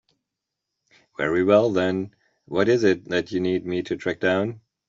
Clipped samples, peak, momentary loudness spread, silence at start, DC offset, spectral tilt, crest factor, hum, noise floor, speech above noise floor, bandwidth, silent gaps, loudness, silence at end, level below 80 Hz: under 0.1%; -6 dBFS; 11 LU; 1.2 s; under 0.1%; -6.5 dB/octave; 18 dB; none; -84 dBFS; 62 dB; 7.6 kHz; none; -23 LUFS; 0.3 s; -62 dBFS